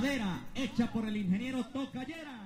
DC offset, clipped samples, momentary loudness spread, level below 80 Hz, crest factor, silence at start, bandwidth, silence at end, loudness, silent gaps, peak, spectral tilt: under 0.1%; under 0.1%; 7 LU; -56 dBFS; 18 dB; 0 s; 16 kHz; 0 s; -35 LUFS; none; -18 dBFS; -6 dB/octave